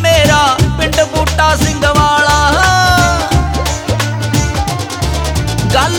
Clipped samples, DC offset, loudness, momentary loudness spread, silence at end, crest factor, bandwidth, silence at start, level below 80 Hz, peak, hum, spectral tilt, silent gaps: under 0.1%; under 0.1%; -11 LUFS; 7 LU; 0 s; 10 dB; over 20 kHz; 0 s; -20 dBFS; 0 dBFS; none; -4 dB/octave; none